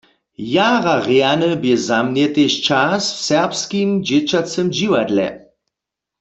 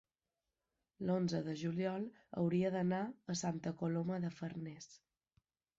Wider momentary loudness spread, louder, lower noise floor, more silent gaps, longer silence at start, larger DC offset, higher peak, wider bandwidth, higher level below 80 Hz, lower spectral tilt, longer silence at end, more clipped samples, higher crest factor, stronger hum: second, 5 LU vs 10 LU; first, -16 LUFS vs -39 LUFS; second, -83 dBFS vs under -90 dBFS; neither; second, 0.4 s vs 1 s; neither; first, -2 dBFS vs -26 dBFS; about the same, 8.2 kHz vs 8 kHz; first, -58 dBFS vs -76 dBFS; second, -4.5 dB/octave vs -7 dB/octave; about the same, 0.8 s vs 0.85 s; neither; about the same, 16 dB vs 14 dB; neither